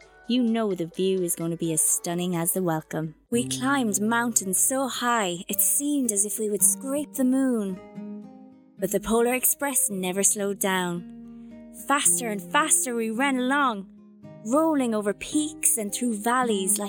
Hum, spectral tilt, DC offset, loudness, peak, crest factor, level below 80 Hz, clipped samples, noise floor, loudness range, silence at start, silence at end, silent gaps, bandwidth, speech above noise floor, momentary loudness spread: none; -3 dB/octave; under 0.1%; -24 LUFS; -4 dBFS; 22 dB; -62 dBFS; under 0.1%; -49 dBFS; 2 LU; 0.3 s; 0 s; none; over 20 kHz; 24 dB; 13 LU